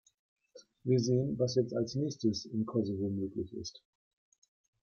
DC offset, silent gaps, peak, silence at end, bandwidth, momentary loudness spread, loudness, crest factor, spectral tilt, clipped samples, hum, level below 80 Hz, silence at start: under 0.1%; none; -16 dBFS; 1.05 s; 7.2 kHz; 11 LU; -34 LUFS; 18 dB; -7 dB/octave; under 0.1%; none; -68 dBFS; 0.55 s